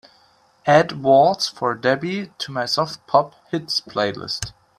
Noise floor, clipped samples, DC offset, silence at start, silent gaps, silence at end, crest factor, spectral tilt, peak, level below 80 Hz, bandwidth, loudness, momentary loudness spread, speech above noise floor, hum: -57 dBFS; under 0.1%; under 0.1%; 0.65 s; none; 0.3 s; 20 dB; -4.5 dB/octave; 0 dBFS; -56 dBFS; 14 kHz; -20 LUFS; 12 LU; 37 dB; none